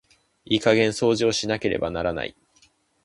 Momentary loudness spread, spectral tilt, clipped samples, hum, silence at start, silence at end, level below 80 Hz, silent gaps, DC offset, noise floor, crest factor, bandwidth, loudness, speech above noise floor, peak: 8 LU; -4.5 dB/octave; under 0.1%; none; 0.5 s; 0.75 s; -50 dBFS; none; under 0.1%; -61 dBFS; 22 dB; 11.5 kHz; -23 LUFS; 39 dB; -4 dBFS